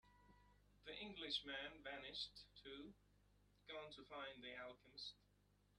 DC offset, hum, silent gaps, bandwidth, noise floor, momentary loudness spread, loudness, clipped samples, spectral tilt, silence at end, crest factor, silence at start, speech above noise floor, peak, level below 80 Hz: under 0.1%; 50 Hz at -75 dBFS; none; 11.5 kHz; -78 dBFS; 12 LU; -53 LUFS; under 0.1%; -3 dB/octave; 0 s; 24 dB; 0.05 s; 23 dB; -32 dBFS; -76 dBFS